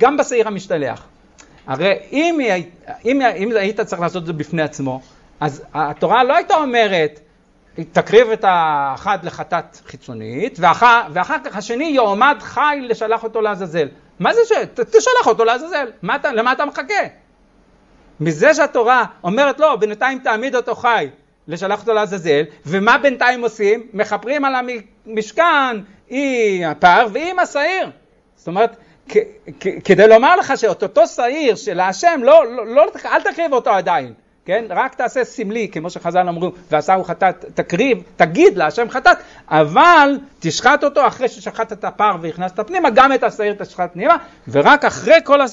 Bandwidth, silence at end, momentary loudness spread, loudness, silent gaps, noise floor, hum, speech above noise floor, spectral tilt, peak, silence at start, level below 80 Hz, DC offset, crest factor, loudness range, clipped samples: 8 kHz; 0 s; 13 LU; -15 LUFS; none; -52 dBFS; none; 37 dB; -4.5 dB/octave; 0 dBFS; 0 s; -54 dBFS; under 0.1%; 16 dB; 5 LU; under 0.1%